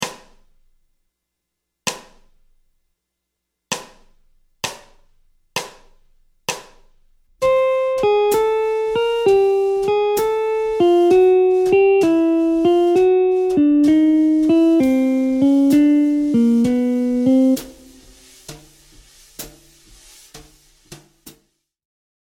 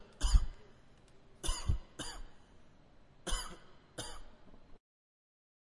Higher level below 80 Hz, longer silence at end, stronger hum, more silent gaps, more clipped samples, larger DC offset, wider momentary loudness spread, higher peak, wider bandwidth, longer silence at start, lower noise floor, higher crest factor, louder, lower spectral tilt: second, -52 dBFS vs -40 dBFS; about the same, 0.9 s vs 1 s; neither; neither; neither; neither; second, 15 LU vs 26 LU; first, -2 dBFS vs -14 dBFS; first, 17 kHz vs 11.5 kHz; about the same, 0 s vs 0 s; first, -79 dBFS vs -60 dBFS; second, 16 dB vs 24 dB; first, -16 LUFS vs -40 LUFS; first, -5 dB/octave vs -3.5 dB/octave